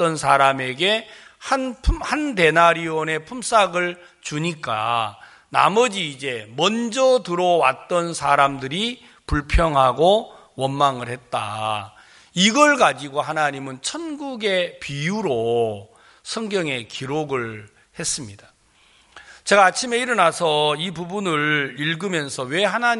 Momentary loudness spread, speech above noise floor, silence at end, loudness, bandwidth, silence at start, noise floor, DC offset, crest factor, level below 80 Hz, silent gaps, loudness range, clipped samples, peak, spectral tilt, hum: 12 LU; 36 dB; 0 s; -20 LUFS; 11.5 kHz; 0 s; -57 dBFS; under 0.1%; 20 dB; -36 dBFS; none; 5 LU; under 0.1%; 0 dBFS; -3.5 dB/octave; none